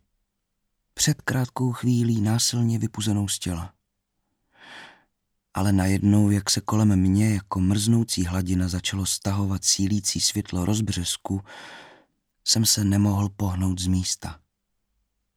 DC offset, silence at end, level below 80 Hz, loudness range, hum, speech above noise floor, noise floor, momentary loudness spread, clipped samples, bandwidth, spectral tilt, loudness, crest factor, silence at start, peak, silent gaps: under 0.1%; 1 s; -50 dBFS; 4 LU; none; 54 dB; -77 dBFS; 11 LU; under 0.1%; 17 kHz; -4.5 dB/octave; -23 LUFS; 18 dB; 0.95 s; -6 dBFS; none